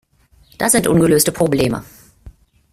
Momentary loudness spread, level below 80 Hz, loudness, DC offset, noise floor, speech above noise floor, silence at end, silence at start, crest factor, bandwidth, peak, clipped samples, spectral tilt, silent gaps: 8 LU; -44 dBFS; -15 LUFS; under 0.1%; -52 dBFS; 37 dB; 0.4 s; 0.6 s; 18 dB; 16 kHz; 0 dBFS; under 0.1%; -4.5 dB/octave; none